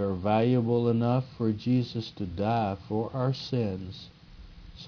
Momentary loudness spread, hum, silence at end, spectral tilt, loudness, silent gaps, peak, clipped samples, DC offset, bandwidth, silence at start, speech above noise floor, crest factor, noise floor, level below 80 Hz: 11 LU; none; 0 s; -8.5 dB/octave; -28 LUFS; none; -12 dBFS; under 0.1%; under 0.1%; 5.4 kHz; 0 s; 21 dB; 16 dB; -48 dBFS; -54 dBFS